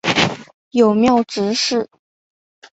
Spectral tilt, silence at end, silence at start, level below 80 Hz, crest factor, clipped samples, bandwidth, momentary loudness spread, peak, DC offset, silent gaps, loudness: -4 dB/octave; 0.95 s; 0.05 s; -54 dBFS; 18 dB; under 0.1%; 8.2 kHz; 11 LU; 0 dBFS; under 0.1%; 0.54-0.71 s; -17 LUFS